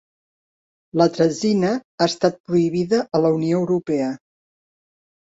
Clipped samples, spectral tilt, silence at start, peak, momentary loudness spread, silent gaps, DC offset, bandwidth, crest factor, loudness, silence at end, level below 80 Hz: under 0.1%; -6 dB/octave; 0.95 s; -2 dBFS; 5 LU; 1.84-1.98 s, 2.40-2.44 s; under 0.1%; 8 kHz; 18 dB; -20 LUFS; 1.25 s; -62 dBFS